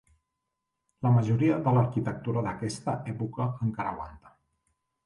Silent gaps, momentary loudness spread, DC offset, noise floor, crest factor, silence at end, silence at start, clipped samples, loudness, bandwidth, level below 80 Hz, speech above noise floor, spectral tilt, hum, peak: none; 10 LU; under 0.1%; -83 dBFS; 16 dB; 0.75 s; 1 s; under 0.1%; -28 LUFS; 11 kHz; -58 dBFS; 56 dB; -8 dB/octave; none; -12 dBFS